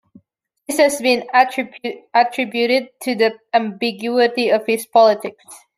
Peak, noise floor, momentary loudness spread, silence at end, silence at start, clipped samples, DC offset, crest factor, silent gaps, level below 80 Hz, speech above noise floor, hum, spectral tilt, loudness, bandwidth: -2 dBFS; -63 dBFS; 10 LU; 0.2 s; 0.7 s; under 0.1%; under 0.1%; 16 dB; none; -70 dBFS; 46 dB; none; -3 dB/octave; -17 LUFS; 15.5 kHz